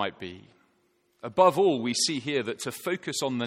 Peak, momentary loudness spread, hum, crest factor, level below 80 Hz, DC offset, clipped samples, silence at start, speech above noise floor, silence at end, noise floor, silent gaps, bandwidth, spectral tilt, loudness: -6 dBFS; 17 LU; none; 20 dB; -72 dBFS; under 0.1%; under 0.1%; 0 s; 42 dB; 0 s; -69 dBFS; none; 16.5 kHz; -3.5 dB/octave; -26 LUFS